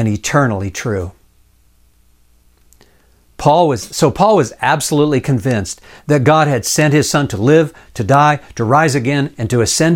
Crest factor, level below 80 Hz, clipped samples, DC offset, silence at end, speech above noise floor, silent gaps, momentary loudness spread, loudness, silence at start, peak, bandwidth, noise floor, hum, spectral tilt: 14 dB; -44 dBFS; under 0.1%; under 0.1%; 0 s; 39 dB; none; 9 LU; -14 LUFS; 0 s; 0 dBFS; 17 kHz; -53 dBFS; none; -5 dB/octave